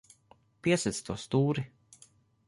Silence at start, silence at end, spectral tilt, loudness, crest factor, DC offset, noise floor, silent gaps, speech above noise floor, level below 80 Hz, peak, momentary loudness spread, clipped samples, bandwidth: 0.65 s; 0.8 s; -5.5 dB/octave; -31 LUFS; 18 dB; under 0.1%; -64 dBFS; none; 34 dB; -62 dBFS; -14 dBFS; 8 LU; under 0.1%; 11.5 kHz